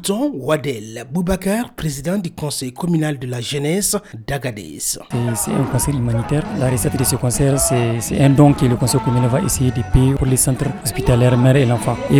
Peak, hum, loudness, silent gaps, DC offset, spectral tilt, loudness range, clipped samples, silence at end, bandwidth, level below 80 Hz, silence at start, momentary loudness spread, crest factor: 0 dBFS; none; -17 LUFS; none; under 0.1%; -5.5 dB/octave; 6 LU; under 0.1%; 0 s; 18 kHz; -32 dBFS; 0 s; 10 LU; 16 dB